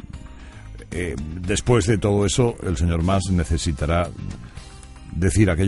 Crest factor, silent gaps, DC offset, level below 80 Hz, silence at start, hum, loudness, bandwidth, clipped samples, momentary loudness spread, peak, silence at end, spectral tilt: 18 dB; none; under 0.1%; -32 dBFS; 0 s; none; -22 LUFS; 11.5 kHz; under 0.1%; 22 LU; -2 dBFS; 0 s; -5.5 dB/octave